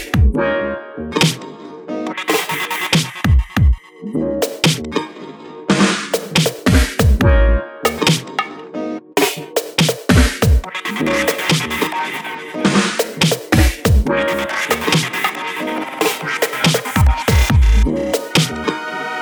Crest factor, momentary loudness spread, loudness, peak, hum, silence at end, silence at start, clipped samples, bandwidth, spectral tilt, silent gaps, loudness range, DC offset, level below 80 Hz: 16 dB; 10 LU; -17 LUFS; 0 dBFS; none; 0 s; 0 s; under 0.1%; over 20 kHz; -4.5 dB/octave; none; 2 LU; under 0.1%; -22 dBFS